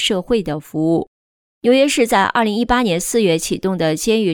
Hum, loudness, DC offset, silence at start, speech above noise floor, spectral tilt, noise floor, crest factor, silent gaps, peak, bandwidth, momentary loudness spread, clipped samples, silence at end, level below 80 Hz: none; -17 LUFS; under 0.1%; 0 s; over 74 dB; -4 dB/octave; under -90 dBFS; 14 dB; 1.07-1.61 s; -2 dBFS; 19.5 kHz; 7 LU; under 0.1%; 0 s; -42 dBFS